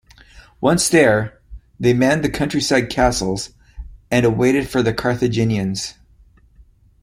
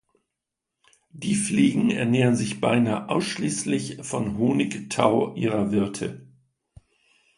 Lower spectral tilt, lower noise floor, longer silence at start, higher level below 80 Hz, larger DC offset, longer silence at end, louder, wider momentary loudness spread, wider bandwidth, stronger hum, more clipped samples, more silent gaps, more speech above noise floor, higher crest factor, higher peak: about the same, -5 dB/octave vs -5.5 dB/octave; second, -51 dBFS vs -85 dBFS; second, 0.35 s vs 1.15 s; first, -38 dBFS vs -58 dBFS; neither; about the same, 1.1 s vs 1.15 s; first, -18 LUFS vs -24 LUFS; about the same, 10 LU vs 8 LU; first, 16 kHz vs 11.5 kHz; neither; neither; neither; second, 34 dB vs 61 dB; about the same, 18 dB vs 22 dB; about the same, -2 dBFS vs -4 dBFS